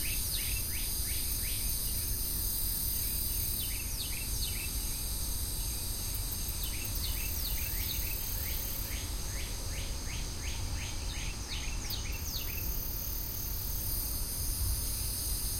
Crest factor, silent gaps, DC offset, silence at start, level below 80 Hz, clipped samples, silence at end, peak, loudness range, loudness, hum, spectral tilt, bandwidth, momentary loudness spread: 14 dB; none; under 0.1%; 0 s; -38 dBFS; under 0.1%; 0 s; -20 dBFS; 5 LU; -34 LUFS; none; -2 dB/octave; 16.5 kHz; 6 LU